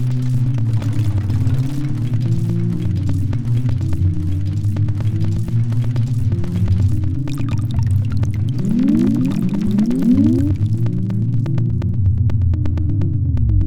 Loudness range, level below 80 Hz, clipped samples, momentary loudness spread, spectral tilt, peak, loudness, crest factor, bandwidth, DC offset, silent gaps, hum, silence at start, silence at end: 3 LU; -30 dBFS; under 0.1%; 4 LU; -9 dB/octave; -4 dBFS; -18 LUFS; 14 dB; 9.6 kHz; 5%; none; none; 0 s; 0 s